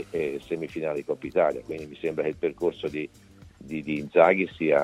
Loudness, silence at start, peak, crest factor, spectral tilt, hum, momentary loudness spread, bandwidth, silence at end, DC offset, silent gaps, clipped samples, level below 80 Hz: -27 LUFS; 0 s; -4 dBFS; 22 dB; -7 dB/octave; none; 15 LU; 12.5 kHz; 0 s; under 0.1%; none; under 0.1%; -58 dBFS